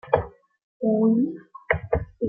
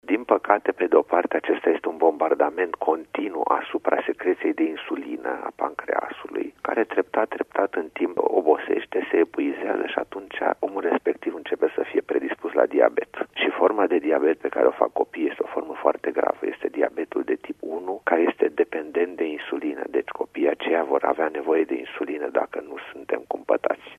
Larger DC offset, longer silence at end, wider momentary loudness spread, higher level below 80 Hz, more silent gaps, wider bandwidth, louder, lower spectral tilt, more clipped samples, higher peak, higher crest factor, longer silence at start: neither; about the same, 0 s vs 0.05 s; first, 13 LU vs 9 LU; first, -44 dBFS vs -70 dBFS; first, 0.63-0.80 s vs none; about the same, 3.6 kHz vs 3.8 kHz; about the same, -24 LUFS vs -24 LUFS; first, -11.5 dB/octave vs -5.5 dB/octave; neither; second, -4 dBFS vs 0 dBFS; about the same, 22 dB vs 24 dB; about the same, 0.05 s vs 0.05 s